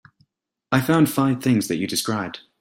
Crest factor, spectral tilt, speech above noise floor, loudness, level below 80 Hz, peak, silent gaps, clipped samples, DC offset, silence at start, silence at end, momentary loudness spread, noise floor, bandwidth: 18 dB; -5 dB/octave; 50 dB; -21 LUFS; -58 dBFS; -4 dBFS; none; under 0.1%; under 0.1%; 0.7 s; 0.2 s; 8 LU; -71 dBFS; 16.5 kHz